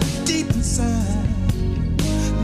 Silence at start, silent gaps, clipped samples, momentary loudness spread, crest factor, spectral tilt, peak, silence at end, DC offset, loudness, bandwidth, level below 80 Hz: 0 s; none; under 0.1%; 2 LU; 12 dB; -5 dB/octave; -8 dBFS; 0 s; under 0.1%; -21 LUFS; 15.5 kHz; -26 dBFS